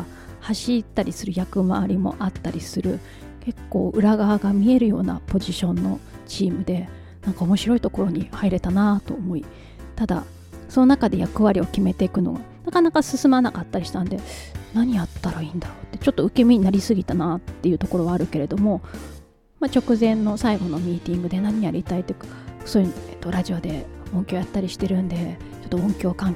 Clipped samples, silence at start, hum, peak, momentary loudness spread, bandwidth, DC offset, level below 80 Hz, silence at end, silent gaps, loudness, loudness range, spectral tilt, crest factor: under 0.1%; 0 s; none; -4 dBFS; 14 LU; 14.5 kHz; under 0.1%; -40 dBFS; 0 s; none; -22 LUFS; 5 LU; -7 dB/octave; 18 dB